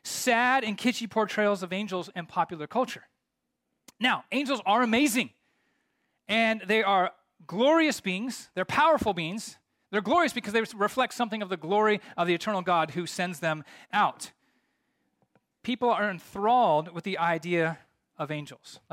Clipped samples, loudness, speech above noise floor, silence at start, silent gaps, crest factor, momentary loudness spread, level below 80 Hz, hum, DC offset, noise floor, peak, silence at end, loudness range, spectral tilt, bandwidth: under 0.1%; -27 LUFS; 55 dB; 0.05 s; none; 16 dB; 12 LU; -68 dBFS; none; under 0.1%; -82 dBFS; -12 dBFS; 0.15 s; 4 LU; -4 dB/octave; 16.5 kHz